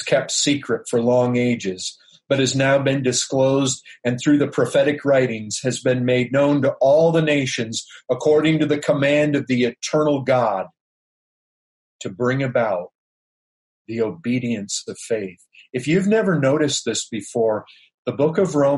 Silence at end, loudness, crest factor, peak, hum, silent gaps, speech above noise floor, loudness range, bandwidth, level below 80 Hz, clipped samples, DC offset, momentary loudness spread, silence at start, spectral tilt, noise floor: 0 s; -20 LUFS; 14 dB; -6 dBFS; none; 10.80-11.99 s, 12.95-13.85 s, 17.94-18.03 s; over 71 dB; 7 LU; 11.5 kHz; -62 dBFS; under 0.1%; under 0.1%; 10 LU; 0 s; -5 dB/octave; under -90 dBFS